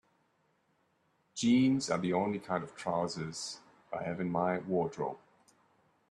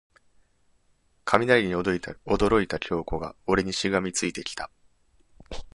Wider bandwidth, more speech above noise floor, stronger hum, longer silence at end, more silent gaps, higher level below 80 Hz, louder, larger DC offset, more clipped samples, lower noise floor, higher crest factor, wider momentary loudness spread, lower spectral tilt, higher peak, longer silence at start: about the same, 11 kHz vs 11.5 kHz; about the same, 42 dB vs 40 dB; neither; first, 0.95 s vs 0.05 s; neither; second, -72 dBFS vs -46 dBFS; second, -33 LUFS vs -25 LUFS; neither; neither; first, -74 dBFS vs -66 dBFS; second, 18 dB vs 26 dB; about the same, 15 LU vs 15 LU; about the same, -5.5 dB/octave vs -4.5 dB/octave; second, -18 dBFS vs -2 dBFS; about the same, 1.35 s vs 1.25 s